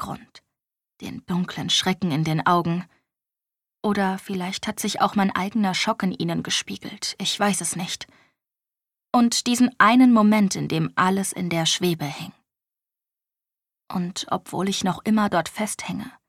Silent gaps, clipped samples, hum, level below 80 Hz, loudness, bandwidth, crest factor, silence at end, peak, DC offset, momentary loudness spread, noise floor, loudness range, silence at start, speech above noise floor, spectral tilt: none; under 0.1%; none; -62 dBFS; -22 LUFS; 16 kHz; 20 dB; 0.2 s; -4 dBFS; under 0.1%; 13 LU; -89 dBFS; 7 LU; 0 s; 67 dB; -4 dB/octave